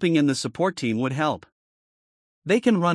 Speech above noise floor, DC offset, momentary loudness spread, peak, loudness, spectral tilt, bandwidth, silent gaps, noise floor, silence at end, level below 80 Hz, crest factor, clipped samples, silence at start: over 68 dB; under 0.1%; 8 LU; -8 dBFS; -23 LUFS; -5.5 dB/octave; 12 kHz; 1.52-2.42 s; under -90 dBFS; 0 s; -68 dBFS; 16 dB; under 0.1%; 0 s